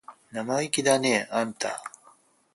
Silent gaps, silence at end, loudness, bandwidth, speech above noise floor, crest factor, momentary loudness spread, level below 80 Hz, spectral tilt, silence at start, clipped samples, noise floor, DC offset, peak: none; 0.65 s; -26 LUFS; 12 kHz; 33 dB; 22 dB; 16 LU; -72 dBFS; -3 dB/octave; 0.1 s; under 0.1%; -59 dBFS; under 0.1%; -6 dBFS